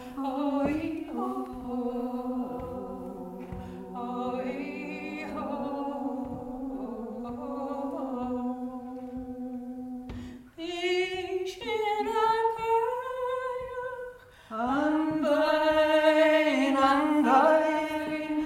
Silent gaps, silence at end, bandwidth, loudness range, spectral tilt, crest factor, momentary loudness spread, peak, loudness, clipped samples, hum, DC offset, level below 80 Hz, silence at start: none; 0 s; 16 kHz; 12 LU; -5 dB/octave; 20 dB; 17 LU; -10 dBFS; -29 LUFS; under 0.1%; none; under 0.1%; -56 dBFS; 0 s